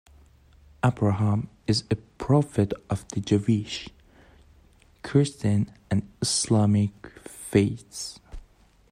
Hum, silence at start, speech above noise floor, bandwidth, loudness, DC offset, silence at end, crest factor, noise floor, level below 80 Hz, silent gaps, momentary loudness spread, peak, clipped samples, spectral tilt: none; 0.85 s; 32 dB; 14.5 kHz; -26 LUFS; under 0.1%; 0.5 s; 20 dB; -57 dBFS; -52 dBFS; none; 14 LU; -6 dBFS; under 0.1%; -6 dB/octave